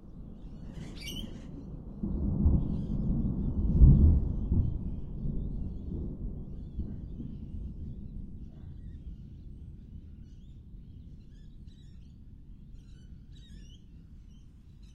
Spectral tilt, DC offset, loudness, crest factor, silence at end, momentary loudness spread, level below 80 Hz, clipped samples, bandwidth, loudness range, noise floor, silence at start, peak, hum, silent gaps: -8.5 dB/octave; under 0.1%; -31 LUFS; 22 dB; 0 s; 24 LU; -34 dBFS; under 0.1%; 6.6 kHz; 24 LU; -51 dBFS; 0 s; -8 dBFS; none; none